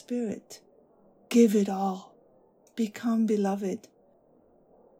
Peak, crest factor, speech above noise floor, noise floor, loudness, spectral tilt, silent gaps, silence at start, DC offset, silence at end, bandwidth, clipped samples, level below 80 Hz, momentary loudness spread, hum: -10 dBFS; 20 dB; 35 dB; -62 dBFS; -27 LUFS; -6.5 dB/octave; none; 0.1 s; under 0.1%; 1.2 s; 16 kHz; under 0.1%; -82 dBFS; 19 LU; none